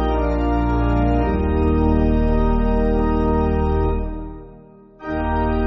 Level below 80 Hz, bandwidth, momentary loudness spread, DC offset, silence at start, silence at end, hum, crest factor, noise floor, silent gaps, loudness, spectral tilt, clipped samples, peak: -22 dBFS; 6 kHz; 10 LU; under 0.1%; 0 s; 0 s; none; 12 dB; -44 dBFS; none; -20 LUFS; -8 dB/octave; under 0.1%; -6 dBFS